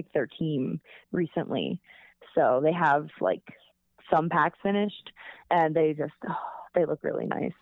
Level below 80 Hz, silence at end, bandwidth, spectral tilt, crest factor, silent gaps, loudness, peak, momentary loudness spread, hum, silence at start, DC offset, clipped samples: -68 dBFS; 0.1 s; 7 kHz; -8.5 dB/octave; 20 dB; none; -28 LUFS; -8 dBFS; 11 LU; none; 0 s; under 0.1%; under 0.1%